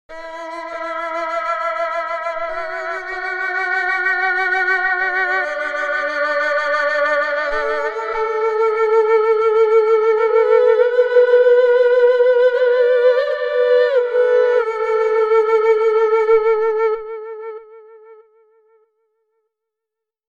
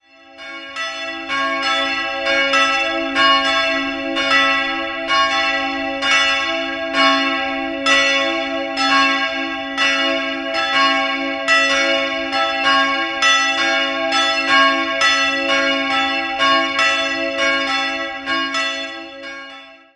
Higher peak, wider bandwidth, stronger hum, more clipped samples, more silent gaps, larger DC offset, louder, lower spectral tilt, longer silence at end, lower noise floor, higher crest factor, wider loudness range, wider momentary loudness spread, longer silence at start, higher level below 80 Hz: about the same, -2 dBFS vs -2 dBFS; second, 7.2 kHz vs 11.5 kHz; neither; neither; neither; neither; about the same, -16 LUFS vs -16 LUFS; about the same, -2 dB/octave vs -1 dB/octave; first, 2.15 s vs 0.2 s; first, -84 dBFS vs -39 dBFS; about the same, 14 dB vs 16 dB; first, 8 LU vs 2 LU; about the same, 11 LU vs 9 LU; second, 0.1 s vs 0.3 s; about the same, -54 dBFS vs -52 dBFS